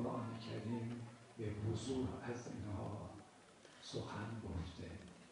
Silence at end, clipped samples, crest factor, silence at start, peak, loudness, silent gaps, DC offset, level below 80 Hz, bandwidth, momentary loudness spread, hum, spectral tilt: 0 s; under 0.1%; 16 dB; 0 s; -30 dBFS; -47 LUFS; none; under 0.1%; -64 dBFS; 10.5 kHz; 13 LU; none; -6.5 dB/octave